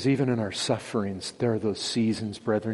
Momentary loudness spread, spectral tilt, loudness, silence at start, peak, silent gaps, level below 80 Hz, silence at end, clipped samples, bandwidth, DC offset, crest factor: 5 LU; -5.5 dB/octave; -28 LUFS; 0 s; -12 dBFS; none; -64 dBFS; 0 s; under 0.1%; 11.5 kHz; under 0.1%; 16 dB